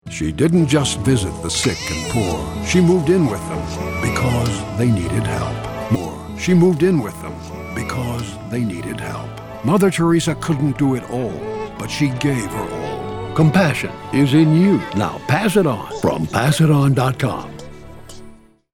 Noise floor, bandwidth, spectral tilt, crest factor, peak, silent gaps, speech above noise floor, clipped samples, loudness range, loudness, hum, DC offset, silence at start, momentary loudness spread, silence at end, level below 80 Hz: -42 dBFS; 17.5 kHz; -6 dB/octave; 16 dB; -2 dBFS; none; 25 dB; under 0.1%; 4 LU; -18 LUFS; none; under 0.1%; 0.05 s; 13 LU; 0.45 s; -38 dBFS